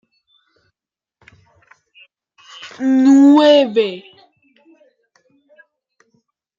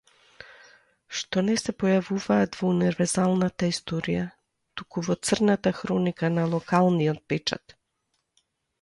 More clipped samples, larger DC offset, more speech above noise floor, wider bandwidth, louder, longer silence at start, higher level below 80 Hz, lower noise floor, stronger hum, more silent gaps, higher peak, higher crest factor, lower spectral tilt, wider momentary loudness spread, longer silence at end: neither; neither; first, 78 dB vs 52 dB; second, 7.6 kHz vs 11.5 kHz; first, -12 LUFS vs -25 LUFS; first, 2.65 s vs 1.1 s; second, -72 dBFS vs -60 dBFS; first, -89 dBFS vs -76 dBFS; neither; neither; first, -2 dBFS vs -8 dBFS; about the same, 16 dB vs 18 dB; about the same, -4.5 dB/octave vs -5.5 dB/octave; first, 26 LU vs 10 LU; first, 2.6 s vs 1.25 s